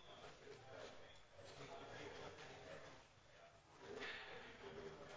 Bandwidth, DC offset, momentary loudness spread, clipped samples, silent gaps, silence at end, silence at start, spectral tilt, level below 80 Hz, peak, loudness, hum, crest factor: 8 kHz; under 0.1%; 14 LU; under 0.1%; none; 0 s; 0 s; -3.5 dB/octave; -76 dBFS; -40 dBFS; -57 LUFS; none; 18 dB